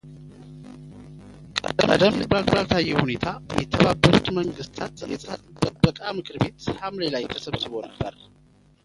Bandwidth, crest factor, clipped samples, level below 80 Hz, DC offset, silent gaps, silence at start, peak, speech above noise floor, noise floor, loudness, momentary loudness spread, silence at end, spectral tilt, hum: 11.5 kHz; 24 dB; under 0.1%; -44 dBFS; under 0.1%; none; 0.05 s; 0 dBFS; 20 dB; -43 dBFS; -24 LUFS; 24 LU; 0.75 s; -6 dB/octave; none